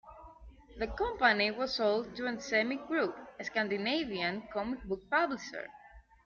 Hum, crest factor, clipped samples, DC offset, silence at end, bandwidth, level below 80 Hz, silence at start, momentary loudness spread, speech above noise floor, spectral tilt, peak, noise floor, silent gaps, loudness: none; 22 dB; under 0.1%; under 0.1%; 0.25 s; 7.4 kHz; -56 dBFS; 0.05 s; 12 LU; 21 dB; -1.5 dB/octave; -12 dBFS; -54 dBFS; none; -33 LUFS